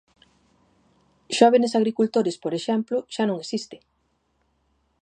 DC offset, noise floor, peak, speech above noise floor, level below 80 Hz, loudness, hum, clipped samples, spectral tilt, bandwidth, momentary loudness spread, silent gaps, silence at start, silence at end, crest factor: under 0.1%; -70 dBFS; -2 dBFS; 48 dB; -74 dBFS; -23 LUFS; none; under 0.1%; -5 dB/octave; 9.8 kHz; 13 LU; none; 1.3 s; 1.25 s; 22 dB